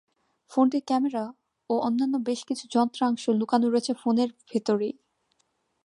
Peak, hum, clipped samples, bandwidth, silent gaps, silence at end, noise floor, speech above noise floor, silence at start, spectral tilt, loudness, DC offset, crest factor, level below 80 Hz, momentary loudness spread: -8 dBFS; none; under 0.1%; 11 kHz; none; 0.95 s; -73 dBFS; 48 dB; 0.5 s; -5.5 dB/octave; -26 LUFS; under 0.1%; 18 dB; -78 dBFS; 8 LU